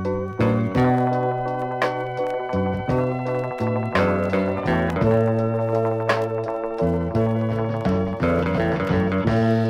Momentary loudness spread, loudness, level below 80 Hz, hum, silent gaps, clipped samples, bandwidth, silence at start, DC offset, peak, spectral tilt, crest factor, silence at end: 6 LU; -22 LUFS; -42 dBFS; none; none; under 0.1%; 10.5 kHz; 0 s; under 0.1%; -4 dBFS; -8.5 dB/octave; 16 dB; 0 s